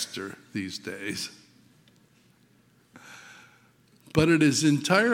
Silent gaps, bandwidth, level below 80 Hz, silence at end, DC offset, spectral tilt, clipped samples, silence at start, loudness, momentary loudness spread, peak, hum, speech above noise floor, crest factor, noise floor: none; 16.5 kHz; -58 dBFS; 0 s; under 0.1%; -4.5 dB/octave; under 0.1%; 0 s; -26 LUFS; 26 LU; -4 dBFS; none; 37 dB; 24 dB; -62 dBFS